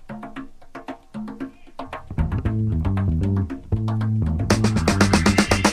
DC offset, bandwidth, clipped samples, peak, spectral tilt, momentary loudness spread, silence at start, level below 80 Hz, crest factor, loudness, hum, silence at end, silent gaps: under 0.1%; 15.5 kHz; under 0.1%; -2 dBFS; -5.5 dB/octave; 20 LU; 0 s; -32 dBFS; 20 dB; -21 LUFS; none; 0 s; none